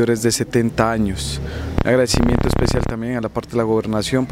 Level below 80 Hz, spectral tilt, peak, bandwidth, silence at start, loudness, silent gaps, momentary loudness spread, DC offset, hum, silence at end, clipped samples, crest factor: -30 dBFS; -5.5 dB/octave; 0 dBFS; 16 kHz; 0 s; -19 LUFS; none; 7 LU; under 0.1%; none; 0 s; under 0.1%; 18 dB